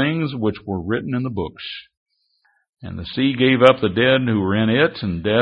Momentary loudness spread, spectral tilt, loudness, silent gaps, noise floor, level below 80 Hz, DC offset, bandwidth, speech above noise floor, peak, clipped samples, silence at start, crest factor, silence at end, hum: 18 LU; -8 dB/octave; -19 LUFS; 1.97-2.06 s, 2.69-2.73 s; -65 dBFS; -48 dBFS; under 0.1%; 8.6 kHz; 46 dB; 0 dBFS; under 0.1%; 0 s; 20 dB; 0 s; none